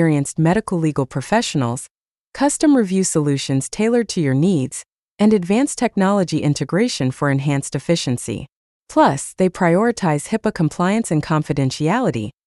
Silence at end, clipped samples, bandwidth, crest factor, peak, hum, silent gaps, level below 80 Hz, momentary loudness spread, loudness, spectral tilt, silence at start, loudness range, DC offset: 0.15 s; under 0.1%; 12 kHz; 16 dB; -2 dBFS; none; 1.91-2.32 s, 4.92-5.16 s, 8.52-8.86 s; -50 dBFS; 6 LU; -18 LUFS; -5.5 dB/octave; 0 s; 1 LU; under 0.1%